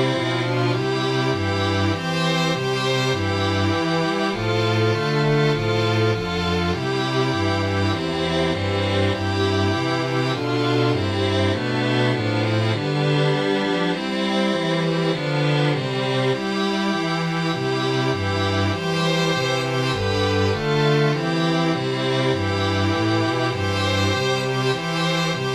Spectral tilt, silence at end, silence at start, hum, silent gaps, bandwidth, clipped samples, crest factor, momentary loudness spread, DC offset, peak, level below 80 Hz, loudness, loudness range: -5.5 dB/octave; 0 s; 0 s; none; none; 13.5 kHz; under 0.1%; 14 dB; 2 LU; under 0.1%; -8 dBFS; -50 dBFS; -21 LUFS; 1 LU